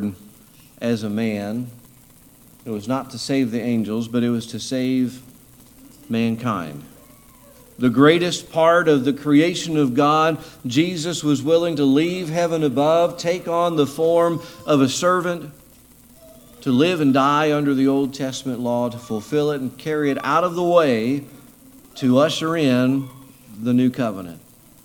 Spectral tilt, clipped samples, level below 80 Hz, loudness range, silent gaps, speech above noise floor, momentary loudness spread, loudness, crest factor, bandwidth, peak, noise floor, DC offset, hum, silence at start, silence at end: -5.5 dB/octave; under 0.1%; -58 dBFS; 7 LU; none; 30 dB; 12 LU; -20 LUFS; 20 dB; 18.5 kHz; 0 dBFS; -49 dBFS; under 0.1%; none; 0 s; 0.45 s